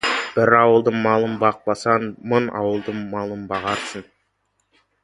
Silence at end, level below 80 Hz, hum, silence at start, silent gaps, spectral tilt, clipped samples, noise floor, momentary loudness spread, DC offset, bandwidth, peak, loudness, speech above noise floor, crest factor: 1 s; -58 dBFS; none; 0.05 s; none; -5.5 dB/octave; under 0.1%; -70 dBFS; 13 LU; under 0.1%; 11.5 kHz; 0 dBFS; -20 LUFS; 50 dB; 20 dB